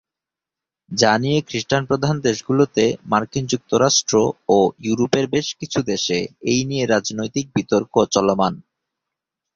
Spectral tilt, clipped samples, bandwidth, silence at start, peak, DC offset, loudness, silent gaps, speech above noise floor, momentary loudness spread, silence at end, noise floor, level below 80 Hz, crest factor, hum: -4.5 dB/octave; under 0.1%; 7.6 kHz; 0.9 s; 0 dBFS; under 0.1%; -19 LUFS; none; 68 dB; 7 LU; 0.95 s; -87 dBFS; -54 dBFS; 18 dB; none